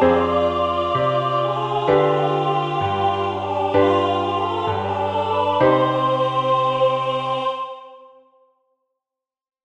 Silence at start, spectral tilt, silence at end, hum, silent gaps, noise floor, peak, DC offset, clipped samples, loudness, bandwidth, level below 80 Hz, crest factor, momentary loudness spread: 0 s; -7 dB/octave; 1.65 s; none; none; -88 dBFS; -4 dBFS; under 0.1%; under 0.1%; -20 LUFS; 8.8 kHz; -52 dBFS; 16 dB; 6 LU